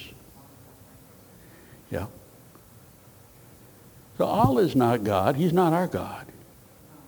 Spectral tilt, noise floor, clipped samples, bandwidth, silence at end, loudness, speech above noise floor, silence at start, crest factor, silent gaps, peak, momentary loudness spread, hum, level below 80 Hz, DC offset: -7.5 dB/octave; -52 dBFS; under 0.1%; over 20 kHz; 0.85 s; -24 LUFS; 29 dB; 0 s; 22 dB; none; -6 dBFS; 20 LU; none; -54 dBFS; under 0.1%